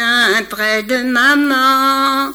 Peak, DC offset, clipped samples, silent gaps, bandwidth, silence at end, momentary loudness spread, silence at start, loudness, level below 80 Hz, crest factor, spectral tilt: -2 dBFS; under 0.1%; under 0.1%; none; over 20 kHz; 0 s; 5 LU; 0 s; -12 LUFS; -52 dBFS; 12 dB; -2 dB/octave